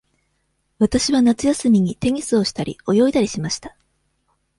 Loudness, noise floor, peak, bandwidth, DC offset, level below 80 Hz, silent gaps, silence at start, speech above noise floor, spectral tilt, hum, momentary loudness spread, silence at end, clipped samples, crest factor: -19 LUFS; -69 dBFS; -4 dBFS; 11.5 kHz; under 0.1%; -46 dBFS; none; 0.8 s; 51 dB; -5 dB/octave; none; 9 LU; 0.9 s; under 0.1%; 16 dB